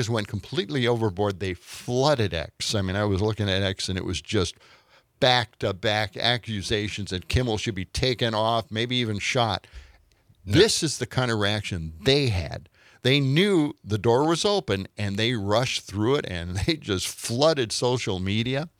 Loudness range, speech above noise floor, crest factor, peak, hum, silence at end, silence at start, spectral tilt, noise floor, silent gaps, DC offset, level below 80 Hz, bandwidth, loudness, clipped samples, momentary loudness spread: 2 LU; 34 dB; 22 dB; -4 dBFS; none; 0.1 s; 0 s; -4.5 dB/octave; -59 dBFS; none; under 0.1%; -48 dBFS; 15.5 kHz; -25 LUFS; under 0.1%; 9 LU